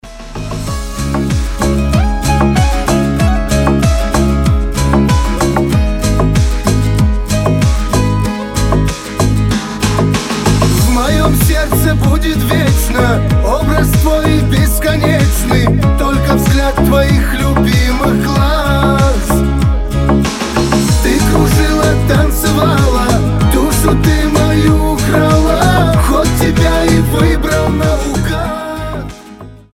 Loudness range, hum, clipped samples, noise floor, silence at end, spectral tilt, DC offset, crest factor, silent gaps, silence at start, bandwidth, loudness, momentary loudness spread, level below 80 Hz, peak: 3 LU; none; under 0.1%; -32 dBFS; 0.2 s; -5.5 dB/octave; under 0.1%; 10 dB; none; 0.05 s; 17 kHz; -12 LUFS; 5 LU; -16 dBFS; 0 dBFS